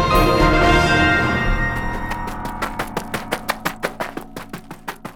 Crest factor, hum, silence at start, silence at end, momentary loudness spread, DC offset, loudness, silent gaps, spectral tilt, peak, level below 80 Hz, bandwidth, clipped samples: 16 dB; none; 0 s; 0 s; 19 LU; under 0.1%; -19 LUFS; none; -5 dB/octave; -2 dBFS; -26 dBFS; 19.5 kHz; under 0.1%